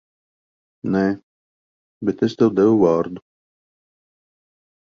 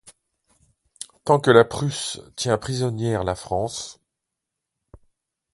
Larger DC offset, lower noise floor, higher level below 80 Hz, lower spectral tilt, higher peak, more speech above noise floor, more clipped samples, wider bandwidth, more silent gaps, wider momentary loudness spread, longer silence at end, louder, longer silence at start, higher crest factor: neither; first, under -90 dBFS vs -83 dBFS; second, -58 dBFS vs -50 dBFS; first, -8 dB/octave vs -5 dB/octave; about the same, -2 dBFS vs 0 dBFS; first, over 72 dB vs 62 dB; neither; second, 7.2 kHz vs 11.5 kHz; first, 1.23-2.01 s vs none; about the same, 16 LU vs 17 LU; about the same, 1.7 s vs 1.6 s; first, -19 LUFS vs -22 LUFS; first, 0.85 s vs 0.05 s; about the same, 20 dB vs 24 dB